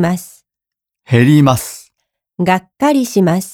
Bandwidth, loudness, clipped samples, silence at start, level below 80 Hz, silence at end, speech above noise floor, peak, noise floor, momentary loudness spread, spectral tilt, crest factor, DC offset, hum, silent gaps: 19 kHz; -13 LUFS; under 0.1%; 0 s; -50 dBFS; 0 s; 72 dB; 0 dBFS; -85 dBFS; 13 LU; -6.5 dB/octave; 14 dB; under 0.1%; none; none